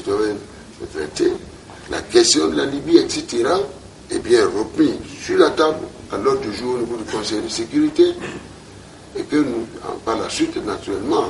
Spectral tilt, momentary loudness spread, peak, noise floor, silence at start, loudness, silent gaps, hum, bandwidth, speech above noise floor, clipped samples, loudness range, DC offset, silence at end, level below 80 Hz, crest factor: -3.5 dB/octave; 16 LU; 0 dBFS; -40 dBFS; 0 s; -19 LUFS; none; none; 11.5 kHz; 21 dB; under 0.1%; 4 LU; under 0.1%; 0 s; -48 dBFS; 20 dB